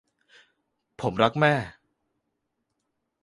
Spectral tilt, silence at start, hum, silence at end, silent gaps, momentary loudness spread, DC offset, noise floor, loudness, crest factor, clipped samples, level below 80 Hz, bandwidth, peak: -6.5 dB/octave; 1 s; none; 1.5 s; none; 12 LU; under 0.1%; -79 dBFS; -24 LUFS; 24 dB; under 0.1%; -60 dBFS; 11.5 kHz; -4 dBFS